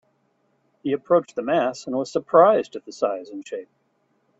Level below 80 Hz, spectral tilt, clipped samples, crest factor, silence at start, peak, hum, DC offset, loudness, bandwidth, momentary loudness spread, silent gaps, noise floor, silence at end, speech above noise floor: -70 dBFS; -5.5 dB/octave; under 0.1%; 22 dB; 0.85 s; -2 dBFS; none; under 0.1%; -22 LUFS; 8 kHz; 18 LU; none; -68 dBFS; 0.75 s; 46 dB